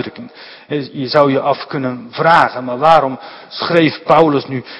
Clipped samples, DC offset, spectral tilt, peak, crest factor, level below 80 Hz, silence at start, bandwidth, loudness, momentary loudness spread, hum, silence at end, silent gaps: 0.4%; under 0.1%; -7 dB/octave; 0 dBFS; 14 dB; -54 dBFS; 0 s; 11 kHz; -14 LUFS; 15 LU; none; 0 s; none